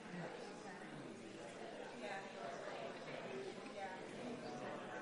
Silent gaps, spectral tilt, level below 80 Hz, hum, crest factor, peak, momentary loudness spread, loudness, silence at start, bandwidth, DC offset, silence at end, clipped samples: none; -4.5 dB/octave; -82 dBFS; none; 14 dB; -34 dBFS; 4 LU; -50 LUFS; 0 s; 10.5 kHz; under 0.1%; 0 s; under 0.1%